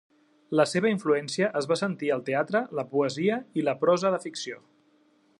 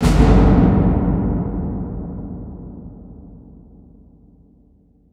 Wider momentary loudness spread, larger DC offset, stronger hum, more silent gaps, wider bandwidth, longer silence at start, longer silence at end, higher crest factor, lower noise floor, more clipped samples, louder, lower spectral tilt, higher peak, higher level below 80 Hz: second, 7 LU vs 25 LU; neither; neither; neither; about the same, 11.5 kHz vs 11.5 kHz; first, 0.5 s vs 0 s; second, 0.85 s vs 1.8 s; about the same, 18 dB vs 18 dB; first, -64 dBFS vs -53 dBFS; neither; second, -27 LUFS vs -17 LUFS; second, -5 dB/octave vs -8 dB/octave; second, -10 dBFS vs 0 dBFS; second, -78 dBFS vs -22 dBFS